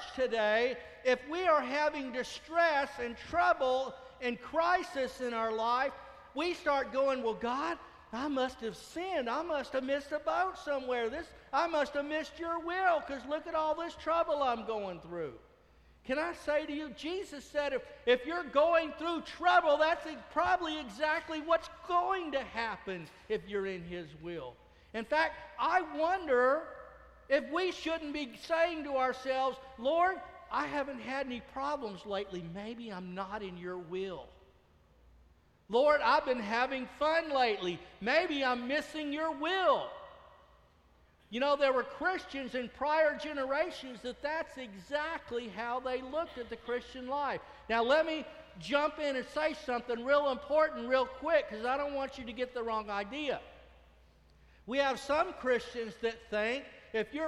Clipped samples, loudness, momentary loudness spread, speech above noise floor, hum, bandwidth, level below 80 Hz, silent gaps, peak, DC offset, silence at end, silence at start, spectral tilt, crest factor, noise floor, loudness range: under 0.1%; -33 LUFS; 12 LU; 32 dB; none; 12.5 kHz; -64 dBFS; none; -14 dBFS; under 0.1%; 0 s; 0 s; -4 dB/octave; 20 dB; -65 dBFS; 6 LU